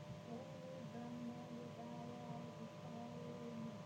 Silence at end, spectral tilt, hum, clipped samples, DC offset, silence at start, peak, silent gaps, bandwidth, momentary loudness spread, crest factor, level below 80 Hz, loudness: 0 s; -6.5 dB/octave; none; under 0.1%; under 0.1%; 0 s; -38 dBFS; none; 16 kHz; 2 LU; 12 dB; -80 dBFS; -52 LUFS